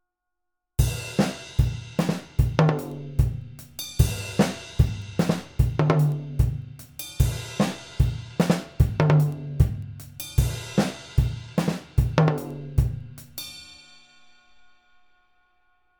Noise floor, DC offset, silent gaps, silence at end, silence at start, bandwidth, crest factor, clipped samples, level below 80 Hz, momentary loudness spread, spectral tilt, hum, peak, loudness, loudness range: -82 dBFS; under 0.1%; none; 2.25 s; 0.8 s; over 20 kHz; 22 dB; under 0.1%; -32 dBFS; 15 LU; -6.5 dB/octave; none; -4 dBFS; -25 LUFS; 4 LU